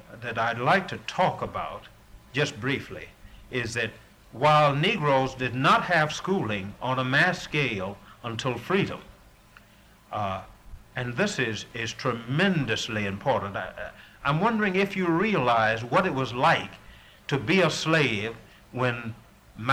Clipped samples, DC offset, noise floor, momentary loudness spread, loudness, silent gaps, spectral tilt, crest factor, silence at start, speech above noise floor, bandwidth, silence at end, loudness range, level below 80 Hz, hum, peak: under 0.1%; under 0.1%; -55 dBFS; 15 LU; -26 LUFS; none; -5 dB/octave; 18 dB; 0.1 s; 29 dB; 16 kHz; 0 s; 7 LU; -56 dBFS; none; -8 dBFS